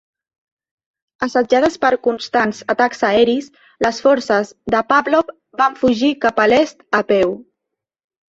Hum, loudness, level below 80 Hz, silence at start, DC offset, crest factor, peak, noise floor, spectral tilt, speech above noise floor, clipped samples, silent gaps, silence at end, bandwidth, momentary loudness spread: none; -16 LUFS; -54 dBFS; 1.2 s; under 0.1%; 16 dB; 0 dBFS; -81 dBFS; -4.5 dB/octave; 65 dB; under 0.1%; none; 0.9 s; 8 kHz; 6 LU